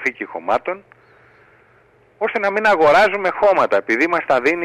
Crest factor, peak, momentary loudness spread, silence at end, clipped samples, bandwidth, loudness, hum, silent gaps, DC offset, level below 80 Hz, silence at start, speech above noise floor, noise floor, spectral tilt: 14 dB; -4 dBFS; 12 LU; 0 s; under 0.1%; 12.5 kHz; -16 LUFS; none; none; under 0.1%; -56 dBFS; 0 s; 37 dB; -53 dBFS; -4.5 dB/octave